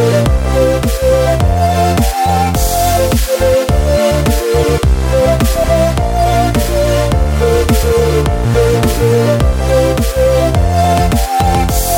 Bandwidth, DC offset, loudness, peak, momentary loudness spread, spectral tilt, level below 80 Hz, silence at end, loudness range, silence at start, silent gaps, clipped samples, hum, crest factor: 17 kHz; 0.1%; -12 LUFS; 0 dBFS; 2 LU; -5.5 dB/octave; -16 dBFS; 0 s; 1 LU; 0 s; none; under 0.1%; none; 10 dB